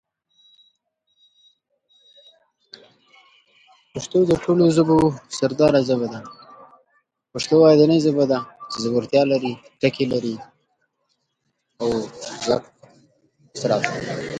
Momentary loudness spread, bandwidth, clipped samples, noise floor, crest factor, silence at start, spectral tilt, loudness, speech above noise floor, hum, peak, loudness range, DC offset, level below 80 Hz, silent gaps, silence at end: 17 LU; 10.5 kHz; under 0.1%; -73 dBFS; 20 dB; 3.95 s; -6 dB/octave; -20 LUFS; 55 dB; none; -2 dBFS; 9 LU; under 0.1%; -56 dBFS; none; 0 s